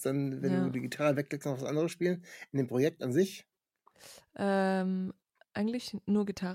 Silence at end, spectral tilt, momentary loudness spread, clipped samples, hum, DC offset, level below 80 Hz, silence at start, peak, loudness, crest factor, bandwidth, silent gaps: 0 s; -6.5 dB/octave; 10 LU; under 0.1%; none; under 0.1%; -74 dBFS; 0 s; -16 dBFS; -32 LUFS; 16 dB; 16 kHz; none